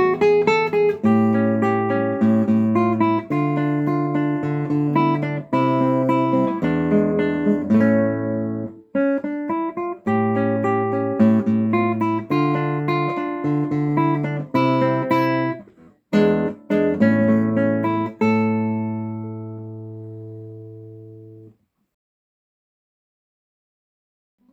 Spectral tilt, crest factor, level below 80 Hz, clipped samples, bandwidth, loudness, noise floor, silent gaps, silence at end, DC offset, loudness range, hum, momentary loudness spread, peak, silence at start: -9 dB/octave; 16 dB; -58 dBFS; under 0.1%; 7.6 kHz; -20 LUFS; -52 dBFS; none; 3.05 s; under 0.1%; 6 LU; none; 11 LU; -4 dBFS; 0 s